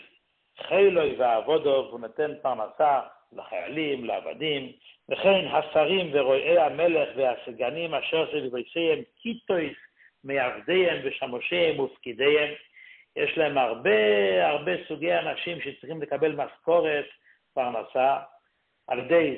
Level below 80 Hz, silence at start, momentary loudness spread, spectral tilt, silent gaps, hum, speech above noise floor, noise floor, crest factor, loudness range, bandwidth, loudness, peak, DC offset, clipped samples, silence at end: -68 dBFS; 0.6 s; 13 LU; -9 dB/octave; none; none; 46 dB; -72 dBFS; 16 dB; 4 LU; 4.3 kHz; -26 LUFS; -10 dBFS; under 0.1%; under 0.1%; 0 s